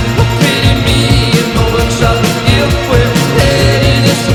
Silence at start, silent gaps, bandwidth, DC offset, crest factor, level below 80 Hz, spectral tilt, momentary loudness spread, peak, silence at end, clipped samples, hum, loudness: 0 s; none; 17.5 kHz; under 0.1%; 10 dB; -20 dBFS; -5 dB/octave; 2 LU; 0 dBFS; 0 s; 0.3%; none; -10 LUFS